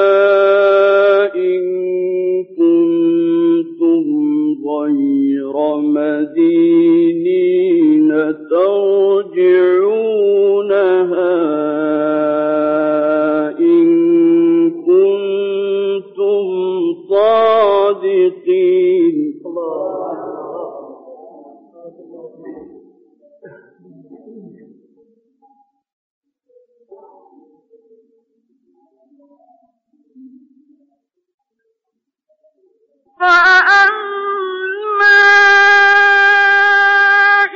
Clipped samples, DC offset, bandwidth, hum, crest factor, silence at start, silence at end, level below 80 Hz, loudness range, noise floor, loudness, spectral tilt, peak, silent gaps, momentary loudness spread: under 0.1%; under 0.1%; 7.2 kHz; none; 12 dB; 0 s; 0 s; -64 dBFS; 9 LU; -76 dBFS; -12 LUFS; -2 dB/octave; -2 dBFS; 25.93-26.22 s, 31.34-31.38 s; 12 LU